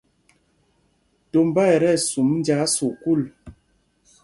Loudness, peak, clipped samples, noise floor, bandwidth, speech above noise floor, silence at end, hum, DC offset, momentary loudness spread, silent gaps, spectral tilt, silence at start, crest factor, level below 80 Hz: -20 LUFS; -4 dBFS; under 0.1%; -65 dBFS; 11.5 kHz; 46 dB; 0.7 s; none; under 0.1%; 6 LU; none; -5 dB/octave; 1.35 s; 18 dB; -58 dBFS